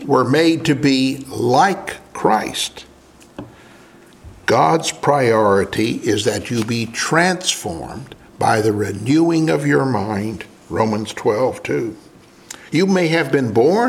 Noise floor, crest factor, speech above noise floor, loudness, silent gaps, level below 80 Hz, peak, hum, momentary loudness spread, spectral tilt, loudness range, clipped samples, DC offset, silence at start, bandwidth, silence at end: -46 dBFS; 18 dB; 29 dB; -17 LUFS; none; -52 dBFS; 0 dBFS; none; 13 LU; -5 dB/octave; 4 LU; under 0.1%; under 0.1%; 0 s; 16 kHz; 0 s